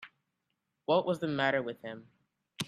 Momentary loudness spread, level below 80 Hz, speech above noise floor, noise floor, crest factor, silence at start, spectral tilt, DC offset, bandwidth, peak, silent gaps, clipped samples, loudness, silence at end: 15 LU; -76 dBFS; 52 dB; -83 dBFS; 22 dB; 0 s; -5 dB/octave; under 0.1%; 14 kHz; -14 dBFS; none; under 0.1%; -31 LUFS; 0 s